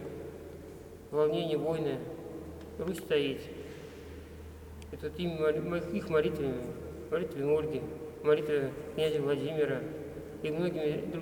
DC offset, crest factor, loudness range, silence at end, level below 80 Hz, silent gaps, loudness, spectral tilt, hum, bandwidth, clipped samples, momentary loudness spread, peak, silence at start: under 0.1%; 18 dB; 4 LU; 0 s; -56 dBFS; none; -33 LUFS; -6.5 dB/octave; none; 19.5 kHz; under 0.1%; 17 LU; -14 dBFS; 0 s